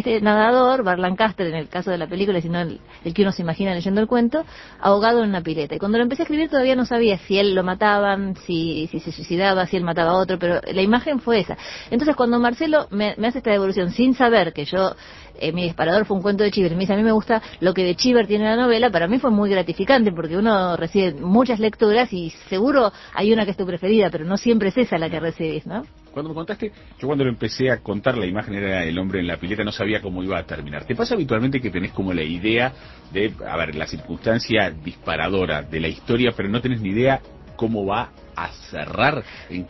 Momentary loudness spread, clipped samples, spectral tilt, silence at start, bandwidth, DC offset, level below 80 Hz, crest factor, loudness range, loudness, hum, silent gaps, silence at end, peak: 10 LU; under 0.1%; -6.5 dB/octave; 0 s; 6.2 kHz; under 0.1%; -44 dBFS; 18 dB; 5 LU; -20 LUFS; none; none; 0 s; -2 dBFS